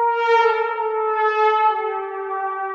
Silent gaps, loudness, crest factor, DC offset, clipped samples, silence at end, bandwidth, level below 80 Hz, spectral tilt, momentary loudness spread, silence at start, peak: none; -19 LUFS; 14 dB; under 0.1%; under 0.1%; 0 s; 7.2 kHz; -84 dBFS; -1.5 dB/octave; 9 LU; 0 s; -6 dBFS